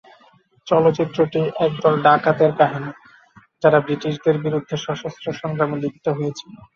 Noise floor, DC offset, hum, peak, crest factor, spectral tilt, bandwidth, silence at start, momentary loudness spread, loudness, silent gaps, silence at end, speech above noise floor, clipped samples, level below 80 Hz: -55 dBFS; under 0.1%; none; -2 dBFS; 18 dB; -7 dB/octave; 7.2 kHz; 0.65 s; 12 LU; -19 LUFS; none; 0.2 s; 36 dB; under 0.1%; -60 dBFS